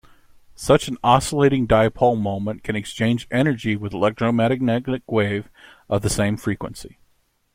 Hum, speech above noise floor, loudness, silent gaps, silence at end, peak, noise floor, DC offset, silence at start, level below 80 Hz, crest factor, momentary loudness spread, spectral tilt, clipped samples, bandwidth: none; 44 dB; -21 LUFS; none; 0.65 s; -2 dBFS; -64 dBFS; under 0.1%; 0.6 s; -44 dBFS; 20 dB; 10 LU; -6 dB/octave; under 0.1%; 16.5 kHz